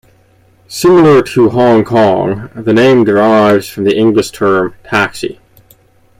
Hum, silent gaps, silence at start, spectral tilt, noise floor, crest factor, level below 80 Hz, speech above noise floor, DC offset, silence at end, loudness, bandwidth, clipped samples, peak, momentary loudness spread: none; none; 0.7 s; -6 dB/octave; -48 dBFS; 10 dB; -46 dBFS; 39 dB; under 0.1%; 0.85 s; -10 LUFS; 16 kHz; under 0.1%; 0 dBFS; 9 LU